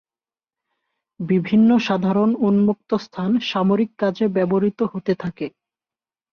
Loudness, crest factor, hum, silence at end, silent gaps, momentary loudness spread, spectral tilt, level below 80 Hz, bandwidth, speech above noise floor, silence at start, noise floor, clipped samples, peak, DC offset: -20 LUFS; 14 dB; none; 0.85 s; none; 9 LU; -8 dB/octave; -60 dBFS; 6.6 kHz; over 71 dB; 1.2 s; under -90 dBFS; under 0.1%; -6 dBFS; under 0.1%